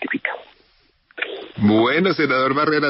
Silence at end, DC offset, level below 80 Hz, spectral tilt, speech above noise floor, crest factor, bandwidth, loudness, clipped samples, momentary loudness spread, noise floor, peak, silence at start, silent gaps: 0 s; under 0.1%; -60 dBFS; -4 dB/octave; 42 dB; 16 dB; 5.8 kHz; -19 LUFS; under 0.1%; 12 LU; -59 dBFS; -4 dBFS; 0 s; none